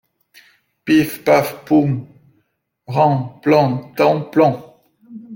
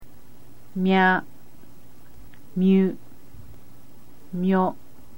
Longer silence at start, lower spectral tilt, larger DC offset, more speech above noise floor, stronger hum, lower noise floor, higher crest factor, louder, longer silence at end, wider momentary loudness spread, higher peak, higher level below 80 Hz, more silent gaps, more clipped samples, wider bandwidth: first, 0.85 s vs 0 s; about the same, -7 dB/octave vs -8 dB/octave; second, under 0.1% vs 2%; first, 51 dB vs 31 dB; neither; first, -66 dBFS vs -52 dBFS; about the same, 16 dB vs 20 dB; first, -16 LUFS vs -22 LUFS; second, 0 s vs 0.45 s; second, 8 LU vs 17 LU; first, -2 dBFS vs -6 dBFS; about the same, -58 dBFS vs -58 dBFS; neither; neither; about the same, 17 kHz vs 16.5 kHz